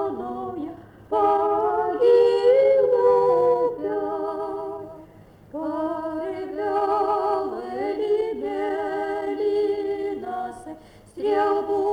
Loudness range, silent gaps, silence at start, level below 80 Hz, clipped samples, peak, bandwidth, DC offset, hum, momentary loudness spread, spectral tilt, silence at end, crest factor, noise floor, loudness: 8 LU; none; 0 s; -58 dBFS; under 0.1%; -8 dBFS; 9.8 kHz; under 0.1%; none; 15 LU; -6.5 dB/octave; 0 s; 14 dB; -48 dBFS; -23 LUFS